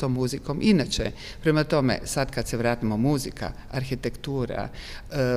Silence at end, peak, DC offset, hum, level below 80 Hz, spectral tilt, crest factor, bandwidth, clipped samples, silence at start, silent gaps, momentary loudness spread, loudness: 0 s; -8 dBFS; under 0.1%; none; -40 dBFS; -5.5 dB/octave; 16 dB; 15.5 kHz; under 0.1%; 0 s; none; 11 LU; -26 LUFS